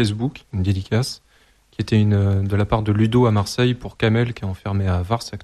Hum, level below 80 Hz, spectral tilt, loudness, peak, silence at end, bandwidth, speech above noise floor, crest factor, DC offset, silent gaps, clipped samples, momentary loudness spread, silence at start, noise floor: none; -42 dBFS; -7 dB/octave; -20 LUFS; -4 dBFS; 0 s; 12.5 kHz; 36 dB; 16 dB; under 0.1%; none; under 0.1%; 10 LU; 0 s; -56 dBFS